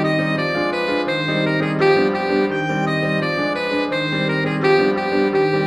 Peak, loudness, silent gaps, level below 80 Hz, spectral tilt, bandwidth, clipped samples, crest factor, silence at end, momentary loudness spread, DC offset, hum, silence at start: -4 dBFS; -19 LUFS; none; -54 dBFS; -6.5 dB/octave; 11 kHz; under 0.1%; 16 dB; 0 s; 4 LU; under 0.1%; none; 0 s